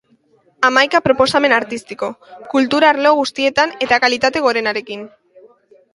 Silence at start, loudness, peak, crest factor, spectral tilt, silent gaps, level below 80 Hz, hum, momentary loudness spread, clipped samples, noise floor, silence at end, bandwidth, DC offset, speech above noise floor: 0.6 s; -15 LUFS; 0 dBFS; 16 dB; -3.5 dB/octave; none; -54 dBFS; none; 13 LU; under 0.1%; -56 dBFS; 0.85 s; 11.5 kHz; under 0.1%; 40 dB